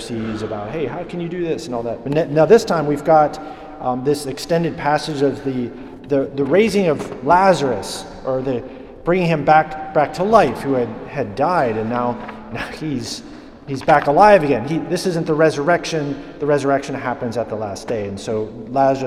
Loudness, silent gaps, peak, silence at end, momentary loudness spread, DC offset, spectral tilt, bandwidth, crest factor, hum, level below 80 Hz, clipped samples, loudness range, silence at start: -18 LUFS; none; 0 dBFS; 0 s; 13 LU; under 0.1%; -6 dB/octave; 14 kHz; 18 dB; none; -46 dBFS; under 0.1%; 4 LU; 0 s